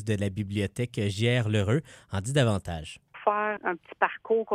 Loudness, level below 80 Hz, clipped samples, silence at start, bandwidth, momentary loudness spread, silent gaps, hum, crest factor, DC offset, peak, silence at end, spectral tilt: -28 LUFS; -54 dBFS; under 0.1%; 0 s; 13 kHz; 9 LU; none; none; 18 dB; under 0.1%; -8 dBFS; 0 s; -6 dB/octave